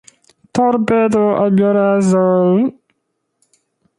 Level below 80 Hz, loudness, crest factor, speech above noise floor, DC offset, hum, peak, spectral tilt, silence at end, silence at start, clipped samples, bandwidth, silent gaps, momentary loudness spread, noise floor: -54 dBFS; -14 LUFS; 14 dB; 58 dB; under 0.1%; none; -2 dBFS; -7.5 dB/octave; 1.25 s; 0.55 s; under 0.1%; 11.5 kHz; none; 4 LU; -71 dBFS